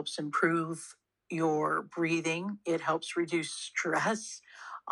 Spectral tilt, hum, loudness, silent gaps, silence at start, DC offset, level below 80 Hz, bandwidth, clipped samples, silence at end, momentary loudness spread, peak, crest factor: -4.5 dB/octave; none; -32 LUFS; none; 0 s; under 0.1%; -86 dBFS; 11 kHz; under 0.1%; 0 s; 14 LU; -14 dBFS; 20 dB